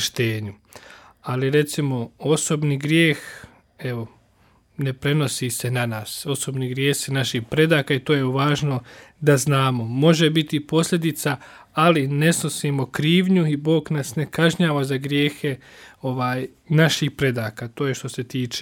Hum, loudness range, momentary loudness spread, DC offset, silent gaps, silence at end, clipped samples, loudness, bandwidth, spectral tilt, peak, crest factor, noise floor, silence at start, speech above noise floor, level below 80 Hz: none; 4 LU; 11 LU; under 0.1%; none; 0 s; under 0.1%; -21 LUFS; 17.5 kHz; -5 dB/octave; -2 dBFS; 18 dB; -58 dBFS; 0 s; 37 dB; -58 dBFS